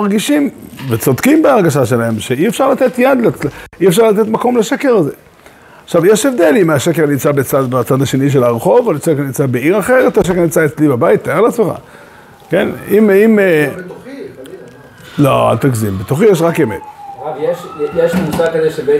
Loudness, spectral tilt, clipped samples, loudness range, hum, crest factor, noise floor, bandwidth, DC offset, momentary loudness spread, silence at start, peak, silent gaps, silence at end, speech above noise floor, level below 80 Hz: -12 LUFS; -6 dB/octave; under 0.1%; 3 LU; none; 12 dB; -40 dBFS; 16 kHz; under 0.1%; 10 LU; 0 s; 0 dBFS; none; 0 s; 29 dB; -46 dBFS